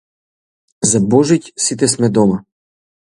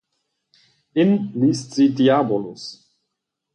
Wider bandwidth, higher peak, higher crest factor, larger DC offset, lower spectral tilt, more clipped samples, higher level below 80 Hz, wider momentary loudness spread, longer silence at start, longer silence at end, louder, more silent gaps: first, 11.5 kHz vs 10 kHz; first, 0 dBFS vs -6 dBFS; about the same, 16 dB vs 16 dB; neither; second, -5 dB/octave vs -6.5 dB/octave; neither; first, -50 dBFS vs -66 dBFS; second, 6 LU vs 16 LU; second, 0.8 s vs 0.95 s; second, 0.65 s vs 0.8 s; first, -14 LUFS vs -19 LUFS; neither